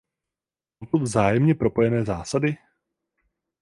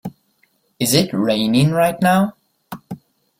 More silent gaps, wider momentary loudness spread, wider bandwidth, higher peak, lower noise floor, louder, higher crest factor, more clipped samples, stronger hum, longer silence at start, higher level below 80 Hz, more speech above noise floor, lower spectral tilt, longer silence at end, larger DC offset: neither; second, 7 LU vs 21 LU; second, 11.5 kHz vs 16.5 kHz; second, -4 dBFS vs 0 dBFS; first, under -90 dBFS vs -62 dBFS; second, -22 LUFS vs -17 LUFS; about the same, 20 dB vs 18 dB; neither; neither; first, 0.8 s vs 0.05 s; about the same, -50 dBFS vs -54 dBFS; first, over 69 dB vs 46 dB; first, -7 dB/octave vs -5 dB/octave; first, 1.05 s vs 0.45 s; neither